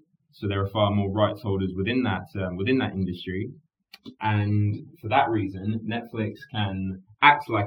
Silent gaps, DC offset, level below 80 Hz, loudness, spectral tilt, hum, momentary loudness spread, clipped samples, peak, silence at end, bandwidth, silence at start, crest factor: none; under 0.1%; -58 dBFS; -25 LUFS; -8.5 dB/octave; none; 12 LU; under 0.1%; -2 dBFS; 0 s; 5.4 kHz; 0.4 s; 24 dB